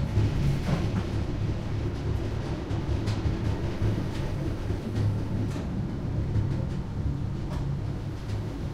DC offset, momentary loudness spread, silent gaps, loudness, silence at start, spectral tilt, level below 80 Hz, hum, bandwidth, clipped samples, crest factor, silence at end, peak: under 0.1%; 5 LU; none; -30 LUFS; 0 s; -7.5 dB/octave; -36 dBFS; none; 11.5 kHz; under 0.1%; 16 dB; 0 s; -14 dBFS